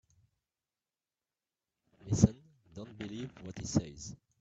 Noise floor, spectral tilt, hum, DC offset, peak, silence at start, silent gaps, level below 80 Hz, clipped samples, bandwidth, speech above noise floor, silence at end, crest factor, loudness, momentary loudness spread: under -90 dBFS; -6.5 dB/octave; none; under 0.1%; -8 dBFS; 2.05 s; none; -56 dBFS; under 0.1%; 8.4 kHz; over 52 dB; 0.25 s; 30 dB; -34 LUFS; 21 LU